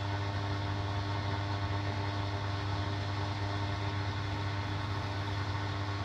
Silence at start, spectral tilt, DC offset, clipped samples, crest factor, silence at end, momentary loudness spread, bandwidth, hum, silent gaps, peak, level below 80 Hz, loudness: 0 s; -6 dB/octave; under 0.1%; under 0.1%; 12 dB; 0 s; 1 LU; 8.4 kHz; none; none; -22 dBFS; -52 dBFS; -35 LUFS